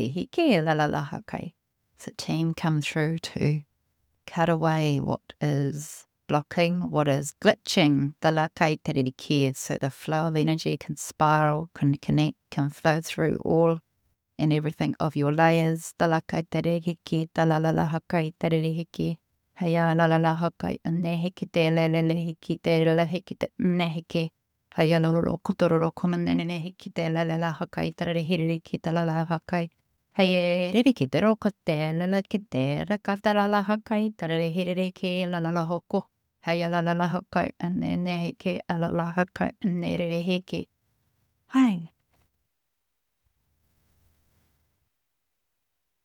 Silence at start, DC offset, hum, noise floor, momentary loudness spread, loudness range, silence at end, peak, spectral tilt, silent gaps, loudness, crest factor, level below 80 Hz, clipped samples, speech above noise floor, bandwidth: 0 s; under 0.1%; none; -81 dBFS; 9 LU; 4 LU; 4.15 s; -4 dBFS; -6.5 dB/octave; none; -26 LUFS; 22 dB; -60 dBFS; under 0.1%; 56 dB; 15 kHz